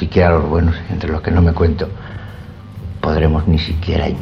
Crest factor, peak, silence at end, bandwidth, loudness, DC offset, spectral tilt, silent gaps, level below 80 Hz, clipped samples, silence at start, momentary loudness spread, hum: 16 dB; 0 dBFS; 0 s; 6 kHz; -16 LUFS; under 0.1%; -9 dB/octave; none; -24 dBFS; under 0.1%; 0 s; 18 LU; none